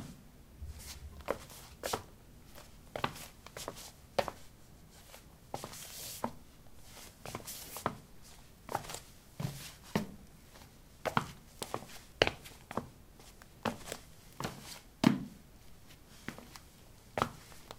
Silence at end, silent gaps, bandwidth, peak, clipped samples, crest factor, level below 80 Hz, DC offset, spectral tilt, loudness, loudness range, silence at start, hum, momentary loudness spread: 0 s; none; 17 kHz; -4 dBFS; under 0.1%; 38 dB; -58 dBFS; under 0.1%; -4 dB/octave; -40 LUFS; 6 LU; 0 s; none; 21 LU